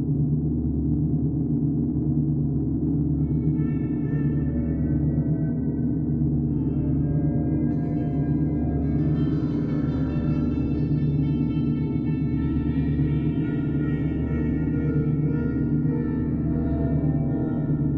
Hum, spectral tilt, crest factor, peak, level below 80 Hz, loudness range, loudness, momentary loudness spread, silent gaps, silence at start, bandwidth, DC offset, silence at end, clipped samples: none; -12 dB/octave; 12 dB; -12 dBFS; -36 dBFS; 0 LU; -24 LUFS; 2 LU; none; 0 s; 4.2 kHz; under 0.1%; 0 s; under 0.1%